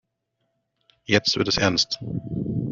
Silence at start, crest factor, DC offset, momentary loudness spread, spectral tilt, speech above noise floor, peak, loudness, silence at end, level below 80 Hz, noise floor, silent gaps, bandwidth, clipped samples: 1.1 s; 22 dB; under 0.1%; 10 LU; -3 dB/octave; 53 dB; -4 dBFS; -22 LUFS; 0 s; -50 dBFS; -76 dBFS; none; 7.6 kHz; under 0.1%